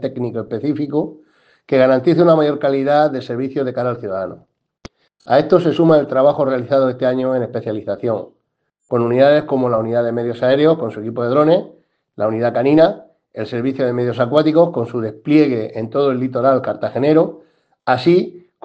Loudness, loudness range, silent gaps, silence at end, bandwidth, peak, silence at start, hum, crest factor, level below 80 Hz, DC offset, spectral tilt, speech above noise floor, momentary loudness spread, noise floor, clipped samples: -16 LUFS; 2 LU; none; 0.25 s; 7.6 kHz; 0 dBFS; 0 s; none; 16 dB; -60 dBFS; under 0.1%; -8.5 dB/octave; 55 dB; 10 LU; -71 dBFS; under 0.1%